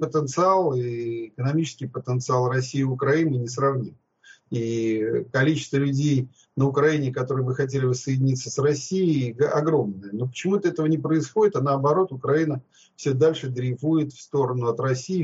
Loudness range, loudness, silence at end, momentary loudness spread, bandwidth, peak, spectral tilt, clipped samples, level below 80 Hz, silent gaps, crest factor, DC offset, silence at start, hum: 2 LU; -24 LUFS; 0 s; 7 LU; 8 kHz; -8 dBFS; -6.5 dB/octave; under 0.1%; -66 dBFS; none; 16 dB; under 0.1%; 0 s; none